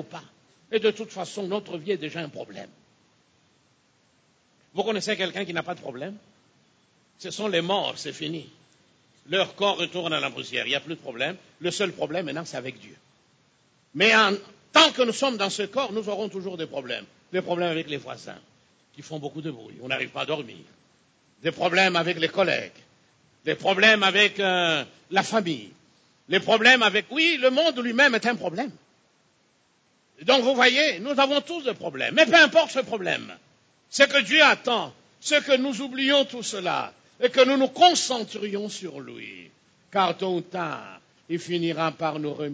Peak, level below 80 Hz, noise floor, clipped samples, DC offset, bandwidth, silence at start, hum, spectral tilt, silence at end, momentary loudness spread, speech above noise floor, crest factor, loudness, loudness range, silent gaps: -2 dBFS; -76 dBFS; -65 dBFS; under 0.1%; under 0.1%; 8 kHz; 0 s; none; -3 dB/octave; 0 s; 18 LU; 41 dB; 22 dB; -23 LUFS; 11 LU; none